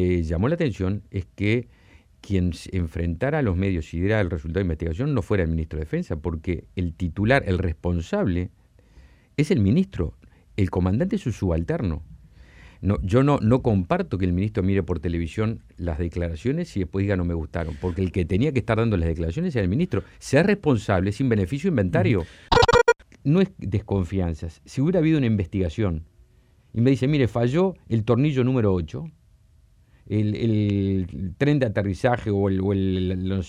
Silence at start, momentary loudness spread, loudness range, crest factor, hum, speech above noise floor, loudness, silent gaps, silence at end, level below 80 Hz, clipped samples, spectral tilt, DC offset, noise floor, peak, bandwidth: 0 s; 8 LU; 5 LU; 20 dB; none; 34 dB; -24 LUFS; none; 0 s; -38 dBFS; under 0.1%; -7.5 dB/octave; under 0.1%; -57 dBFS; -2 dBFS; 11 kHz